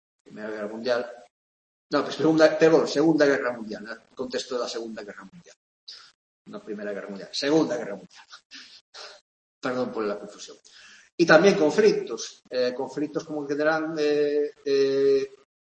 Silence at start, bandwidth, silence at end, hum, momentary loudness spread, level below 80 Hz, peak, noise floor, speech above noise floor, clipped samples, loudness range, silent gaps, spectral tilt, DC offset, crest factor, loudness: 0.35 s; 8.6 kHz; 0.4 s; none; 23 LU; -72 dBFS; -2 dBFS; under -90 dBFS; over 66 dB; under 0.1%; 12 LU; 1.30-1.90 s, 5.56-5.87 s, 6.15-6.45 s, 8.45-8.50 s, 8.81-8.92 s, 9.21-9.61 s, 11.12-11.18 s; -5 dB/octave; under 0.1%; 24 dB; -24 LUFS